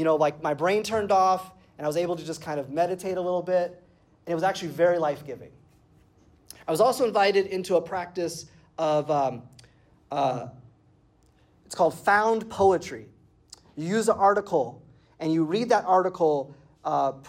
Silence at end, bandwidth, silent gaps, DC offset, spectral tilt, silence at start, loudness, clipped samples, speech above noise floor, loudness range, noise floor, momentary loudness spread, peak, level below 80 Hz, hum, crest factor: 0 s; 16 kHz; none; under 0.1%; -5 dB/octave; 0 s; -25 LUFS; under 0.1%; 36 dB; 5 LU; -61 dBFS; 15 LU; -10 dBFS; -66 dBFS; none; 16 dB